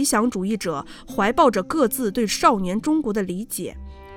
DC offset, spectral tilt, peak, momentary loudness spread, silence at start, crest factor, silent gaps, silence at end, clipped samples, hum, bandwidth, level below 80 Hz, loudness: under 0.1%; -4.5 dB/octave; -2 dBFS; 12 LU; 0 s; 18 dB; none; 0 s; under 0.1%; none; 18.5 kHz; -46 dBFS; -22 LUFS